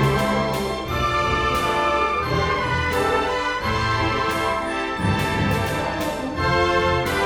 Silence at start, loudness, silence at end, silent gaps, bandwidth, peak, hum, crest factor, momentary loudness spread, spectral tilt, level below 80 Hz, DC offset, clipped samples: 0 s; -21 LUFS; 0 s; none; over 20 kHz; -8 dBFS; none; 14 dB; 4 LU; -5 dB/octave; -36 dBFS; under 0.1%; under 0.1%